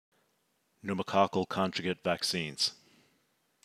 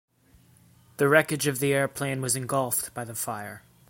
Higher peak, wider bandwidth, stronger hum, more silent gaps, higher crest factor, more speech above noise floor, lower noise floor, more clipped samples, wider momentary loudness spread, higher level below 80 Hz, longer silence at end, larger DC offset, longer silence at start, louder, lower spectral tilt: second, -12 dBFS vs -4 dBFS; about the same, 15.5 kHz vs 17 kHz; neither; neither; about the same, 22 dB vs 24 dB; first, 44 dB vs 33 dB; first, -75 dBFS vs -59 dBFS; neither; second, 8 LU vs 13 LU; second, -76 dBFS vs -66 dBFS; first, 0.9 s vs 0.3 s; neither; second, 0.85 s vs 1 s; second, -31 LUFS vs -26 LUFS; about the same, -4 dB/octave vs -4 dB/octave